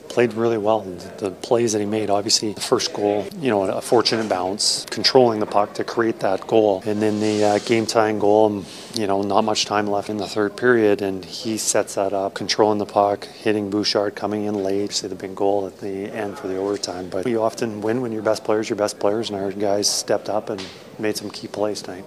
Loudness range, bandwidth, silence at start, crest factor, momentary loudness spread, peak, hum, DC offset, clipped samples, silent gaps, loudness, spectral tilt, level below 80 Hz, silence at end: 5 LU; 15.5 kHz; 0.05 s; 20 dB; 9 LU; 0 dBFS; none; under 0.1%; under 0.1%; none; -21 LUFS; -3.5 dB/octave; -64 dBFS; 0 s